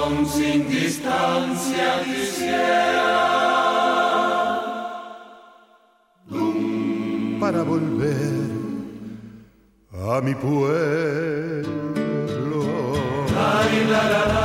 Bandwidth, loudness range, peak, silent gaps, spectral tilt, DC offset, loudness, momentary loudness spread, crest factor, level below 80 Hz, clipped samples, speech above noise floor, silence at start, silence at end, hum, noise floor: 16 kHz; 6 LU; -8 dBFS; none; -5.5 dB/octave; under 0.1%; -22 LUFS; 12 LU; 14 dB; -50 dBFS; under 0.1%; 37 dB; 0 s; 0 s; none; -58 dBFS